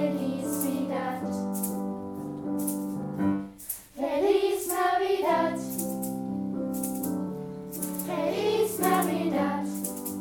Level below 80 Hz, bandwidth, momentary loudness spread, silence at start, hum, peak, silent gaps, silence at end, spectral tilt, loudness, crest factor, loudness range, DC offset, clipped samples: -64 dBFS; 19 kHz; 10 LU; 0 s; none; -12 dBFS; none; 0 s; -5 dB/octave; -29 LUFS; 18 dB; 4 LU; under 0.1%; under 0.1%